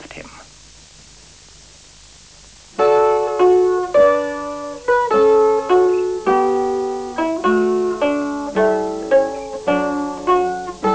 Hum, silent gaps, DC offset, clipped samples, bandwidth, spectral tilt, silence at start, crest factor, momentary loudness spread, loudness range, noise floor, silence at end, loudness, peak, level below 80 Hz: none; none; 0.2%; under 0.1%; 8 kHz; -5.5 dB/octave; 0 s; 14 dB; 10 LU; 4 LU; -44 dBFS; 0 s; -17 LUFS; -2 dBFS; -50 dBFS